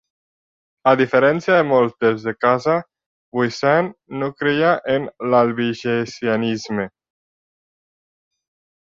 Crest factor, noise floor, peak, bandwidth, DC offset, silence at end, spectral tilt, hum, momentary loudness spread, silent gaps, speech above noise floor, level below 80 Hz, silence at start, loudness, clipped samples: 18 dB; under -90 dBFS; -2 dBFS; 7.6 kHz; under 0.1%; 1.95 s; -6 dB/octave; none; 10 LU; 3.06-3.32 s; over 72 dB; -62 dBFS; 0.85 s; -19 LUFS; under 0.1%